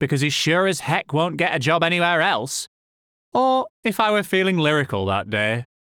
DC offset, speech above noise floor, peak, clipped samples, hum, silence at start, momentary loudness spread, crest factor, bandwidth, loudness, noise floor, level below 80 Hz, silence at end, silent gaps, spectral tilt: under 0.1%; over 70 dB; -6 dBFS; under 0.1%; none; 0 s; 6 LU; 16 dB; over 20 kHz; -20 LUFS; under -90 dBFS; -66 dBFS; 0.2 s; 2.67-3.32 s, 3.70-3.83 s; -4.5 dB/octave